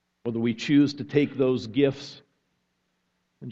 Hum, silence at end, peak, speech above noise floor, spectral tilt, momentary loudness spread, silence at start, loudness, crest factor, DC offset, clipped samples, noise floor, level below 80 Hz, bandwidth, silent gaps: none; 0 s; -8 dBFS; 51 dB; -7 dB/octave; 17 LU; 0.25 s; -25 LUFS; 18 dB; under 0.1%; under 0.1%; -75 dBFS; -64 dBFS; 7.6 kHz; none